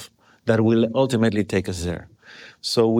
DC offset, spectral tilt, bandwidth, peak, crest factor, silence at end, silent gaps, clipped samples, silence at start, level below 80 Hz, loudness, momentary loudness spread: under 0.1%; -6 dB/octave; 15.5 kHz; -6 dBFS; 16 dB; 0 s; none; under 0.1%; 0 s; -48 dBFS; -22 LUFS; 11 LU